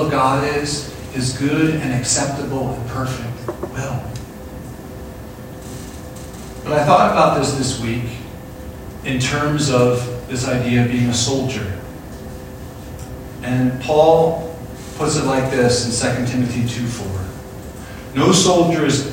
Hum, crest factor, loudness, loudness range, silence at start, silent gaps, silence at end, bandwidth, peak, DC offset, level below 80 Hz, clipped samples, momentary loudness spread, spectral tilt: none; 18 dB; -18 LUFS; 9 LU; 0 s; none; 0 s; 16.5 kHz; 0 dBFS; under 0.1%; -40 dBFS; under 0.1%; 19 LU; -5 dB/octave